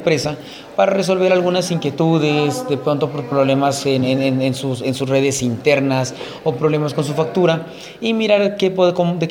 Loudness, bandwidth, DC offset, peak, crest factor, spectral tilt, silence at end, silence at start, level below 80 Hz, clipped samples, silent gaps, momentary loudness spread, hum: -17 LUFS; 16.5 kHz; under 0.1%; 0 dBFS; 16 dB; -5.5 dB/octave; 0 s; 0 s; -56 dBFS; under 0.1%; none; 6 LU; none